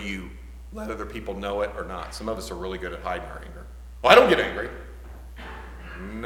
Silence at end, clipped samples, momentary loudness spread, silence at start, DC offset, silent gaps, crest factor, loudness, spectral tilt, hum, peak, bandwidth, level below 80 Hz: 0 s; under 0.1%; 27 LU; 0 s; under 0.1%; none; 26 dB; -24 LUFS; -4.5 dB/octave; none; 0 dBFS; 17 kHz; -40 dBFS